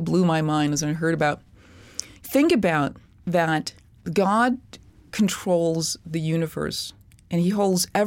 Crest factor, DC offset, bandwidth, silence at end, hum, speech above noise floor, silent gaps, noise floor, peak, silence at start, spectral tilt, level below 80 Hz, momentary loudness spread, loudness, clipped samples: 18 dB; under 0.1%; 17 kHz; 0 s; none; 27 dB; none; -49 dBFS; -6 dBFS; 0 s; -5 dB/octave; -54 dBFS; 15 LU; -23 LUFS; under 0.1%